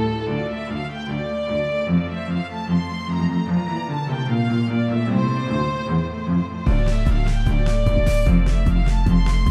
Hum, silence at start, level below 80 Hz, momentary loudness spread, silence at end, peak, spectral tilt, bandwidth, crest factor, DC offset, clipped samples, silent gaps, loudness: none; 0 s; -22 dBFS; 7 LU; 0 s; -4 dBFS; -7.5 dB/octave; 10.5 kHz; 14 dB; under 0.1%; under 0.1%; none; -22 LUFS